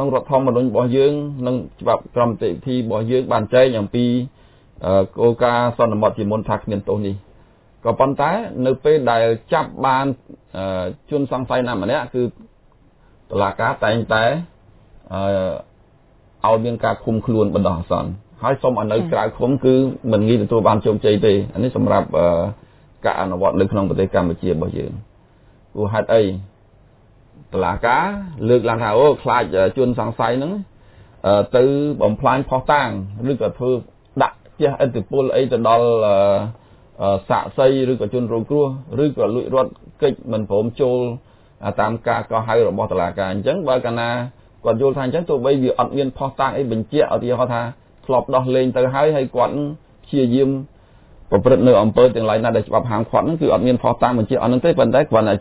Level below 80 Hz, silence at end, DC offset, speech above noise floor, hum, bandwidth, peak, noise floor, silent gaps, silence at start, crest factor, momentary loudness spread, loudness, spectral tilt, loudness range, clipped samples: -44 dBFS; 0 s; under 0.1%; 34 dB; none; 4 kHz; 0 dBFS; -52 dBFS; none; 0 s; 18 dB; 9 LU; -18 LUFS; -11 dB/octave; 5 LU; under 0.1%